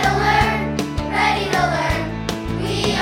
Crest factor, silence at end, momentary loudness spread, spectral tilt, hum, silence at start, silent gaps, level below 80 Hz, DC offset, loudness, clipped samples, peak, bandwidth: 16 dB; 0 s; 8 LU; -5 dB/octave; none; 0 s; none; -32 dBFS; under 0.1%; -19 LUFS; under 0.1%; -4 dBFS; 17.5 kHz